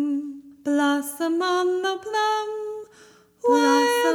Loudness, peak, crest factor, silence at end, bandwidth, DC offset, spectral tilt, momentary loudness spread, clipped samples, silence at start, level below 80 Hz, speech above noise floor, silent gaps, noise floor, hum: -23 LUFS; -8 dBFS; 16 dB; 0 s; 19.5 kHz; under 0.1%; -2 dB/octave; 14 LU; under 0.1%; 0 s; -74 dBFS; 31 dB; none; -53 dBFS; none